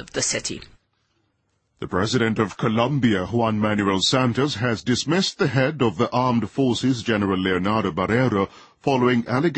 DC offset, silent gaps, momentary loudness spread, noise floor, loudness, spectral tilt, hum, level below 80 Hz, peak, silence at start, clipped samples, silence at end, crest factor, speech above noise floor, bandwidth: under 0.1%; none; 5 LU; -70 dBFS; -21 LUFS; -5 dB/octave; none; -52 dBFS; -6 dBFS; 0 s; under 0.1%; 0 s; 16 dB; 49 dB; 8.8 kHz